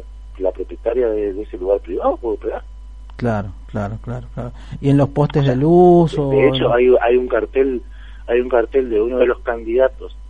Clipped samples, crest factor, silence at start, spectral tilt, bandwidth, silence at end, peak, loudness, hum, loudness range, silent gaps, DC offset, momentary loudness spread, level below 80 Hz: under 0.1%; 16 dB; 0 s; -8.5 dB/octave; 8.6 kHz; 0 s; 0 dBFS; -17 LUFS; none; 9 LU; none; 0.5%; 15 LU; -34 dBFS